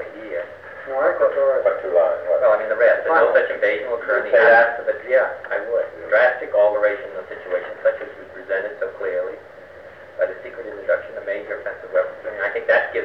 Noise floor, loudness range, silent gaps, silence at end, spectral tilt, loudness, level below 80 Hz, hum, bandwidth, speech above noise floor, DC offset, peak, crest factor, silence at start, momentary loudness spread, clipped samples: -41 dBFS; 10 LU; none; 0 s; -5.5 dB/octave; -20 LUFS; -64 dBFS; none; 5.6 kHz; 21 dB; 0.1%; -2 dBFS; 18 dB; 0 s; 14 LU; under 0.1%